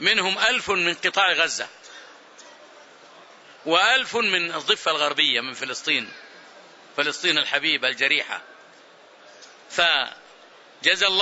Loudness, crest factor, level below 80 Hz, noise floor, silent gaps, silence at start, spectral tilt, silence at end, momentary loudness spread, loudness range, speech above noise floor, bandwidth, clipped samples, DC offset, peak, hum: -21 LUFS; 22 dB; -68 dBFS; -50 dBFS; none; 0 s; -1 dB/octave; 0 s; 14 LU; 3 LU; 28 dB; 8.2 kHz; under 0.1%; under 0.1%; -4 dBFS; none